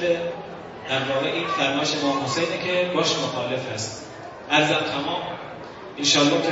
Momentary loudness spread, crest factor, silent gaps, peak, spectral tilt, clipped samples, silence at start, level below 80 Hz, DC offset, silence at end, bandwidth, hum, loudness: 17 LU; 20 dB; none; -4 dBFS; -3.5 dB/octave; under 0.1%; 0 s; -62 dBFS; under 0.1%; 0 s; 8 kHz; none; -23 LUFS